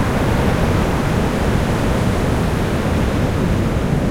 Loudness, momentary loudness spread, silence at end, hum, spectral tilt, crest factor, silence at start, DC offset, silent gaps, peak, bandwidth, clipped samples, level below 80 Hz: -18 LUFS; 2 LU; 0 s; none; -6.5 dB/octave; 12 dB; 0 s; under 0.1%; none; -4 dBFS; 16.5 kHz; under 0.1%; -24 dBFS